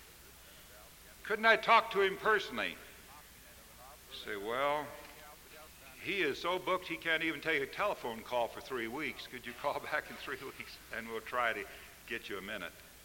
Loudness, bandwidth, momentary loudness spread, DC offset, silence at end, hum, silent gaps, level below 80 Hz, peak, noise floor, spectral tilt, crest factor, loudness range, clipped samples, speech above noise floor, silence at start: -35 LUFS; 17 kHz; 23 LU; under 0.1%; 0 s; none; none; -64 dBFS; -12 dBFS; -56 dBFS; -3 dB/octave; 24 dB; 7 LU; under 0.1%; 21 dB; 0 s